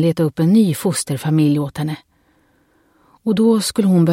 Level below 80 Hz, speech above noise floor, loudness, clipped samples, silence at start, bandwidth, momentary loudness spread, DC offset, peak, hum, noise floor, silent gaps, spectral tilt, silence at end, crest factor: -56 dBFS; 43 dB; -17 LUFS; under 0.1%; 0 s; 16.5 kHz; 11 LU; under 0.1%; -4 dBFS; none; -58 dBFS; none; -6.5 dB/octave; 0 s; 12 dB